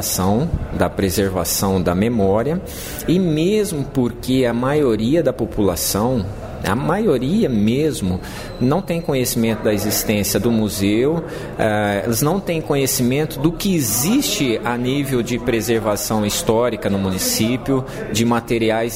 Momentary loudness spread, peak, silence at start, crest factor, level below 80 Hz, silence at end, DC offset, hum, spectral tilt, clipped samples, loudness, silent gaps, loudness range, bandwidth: 5 LU; -2 dBFS; 0 s; 16 dB; -36 dBFS; 0 s; under 0.1%; none; -5 dB/octave; under 0.1%; -18 LUFS; none; 1 LU; 16.5 kHz